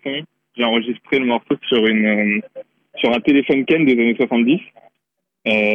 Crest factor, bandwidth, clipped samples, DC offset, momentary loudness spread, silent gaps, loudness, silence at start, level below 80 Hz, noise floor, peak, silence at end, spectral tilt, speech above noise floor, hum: 12 dB; 5.6 kHz; under 0.1%; under 0.1%; 11 LU; none; -17 LUFS; 0.05 s; -62 dBFS; -76 dBFS; -6 dBFS; 0 s; -7.5 dB/octave; 59 dB; none